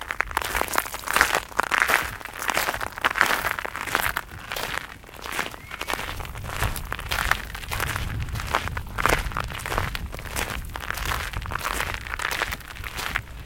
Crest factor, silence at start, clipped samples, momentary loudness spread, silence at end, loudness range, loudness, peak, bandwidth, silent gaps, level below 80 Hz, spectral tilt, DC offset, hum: 28 dB; 0 s; under 0.1%; 11 LU; 0 s; 6 LU; -26 LUFS; 0 dBFS; 17 kHz; none; -38 dBFS; -2.5 dB/octave; under 0.1%; none